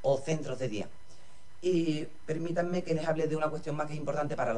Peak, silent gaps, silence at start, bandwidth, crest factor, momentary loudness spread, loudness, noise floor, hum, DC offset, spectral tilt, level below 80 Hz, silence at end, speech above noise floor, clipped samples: -16 dBFS; none; 0.05 s; 11 kHz; 16 dB; 7 LU; -33 LUFS; -59 dBFS; none; 1%; -6.5 dB/octave; -64 dBFS; 0 s; 27 dB; under 0.1%